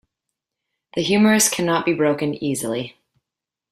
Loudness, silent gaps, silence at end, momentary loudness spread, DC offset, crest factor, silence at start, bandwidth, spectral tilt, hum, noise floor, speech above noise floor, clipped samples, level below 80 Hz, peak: -19 LUFS; none; 0.8 s; 13 LU; under 0.1%; 18 dB; 0.95 s; 16 kHz; -3.5 dB/octave; none; -86 dBFS; 67 dB; under 0.1%; -60 dBFS; -4 dBFS